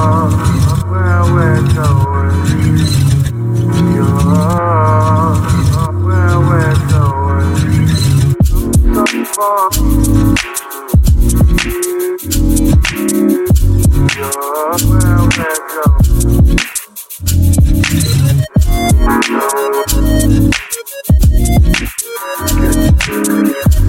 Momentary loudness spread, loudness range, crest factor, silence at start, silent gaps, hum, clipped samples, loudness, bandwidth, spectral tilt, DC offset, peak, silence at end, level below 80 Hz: 5 LU; 1 LU; 10 dB; 0 s; none; none; under 0.1%; -12 LUFS; 17 kHz; -5.5 dB/octave; under 0.1%; 0 dBFS; 0 s; -16 dBFS